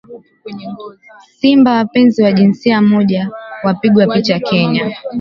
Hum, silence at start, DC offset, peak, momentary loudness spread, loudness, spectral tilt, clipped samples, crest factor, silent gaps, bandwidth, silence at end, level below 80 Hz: none; 0.1 s; under 0.1%; 0 dBFS; 18 LU; -12 LUFS; -7.5 dB/octave; under 0.1%; 12 dB; none; 7 kHz; 0 s; -54 dBFS